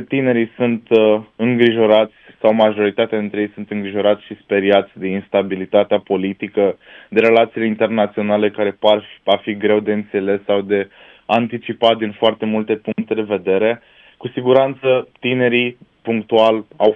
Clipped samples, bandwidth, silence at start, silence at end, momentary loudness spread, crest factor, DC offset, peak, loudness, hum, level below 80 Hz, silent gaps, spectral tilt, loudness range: under 0.1%; 5.8 kHz; 0 s; 0 s; 9 LU; 16 dB; under 0.1%; 0 dBFS; -17 LUFS; none; -64 dBFS; none; -8 dB/octave; 3 LU